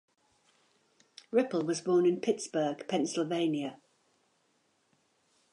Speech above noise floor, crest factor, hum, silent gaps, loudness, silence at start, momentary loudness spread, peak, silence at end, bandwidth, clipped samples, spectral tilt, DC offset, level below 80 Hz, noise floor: 43 dB; 18 dB; none; none; -31 LUFS; 1.3 s; 6 LU; -16 dBFS; 1.75 s; 11 kHz; under 0.1%; -5 dB/octave; under 0.1%; -88 dBFS; -73 dBFS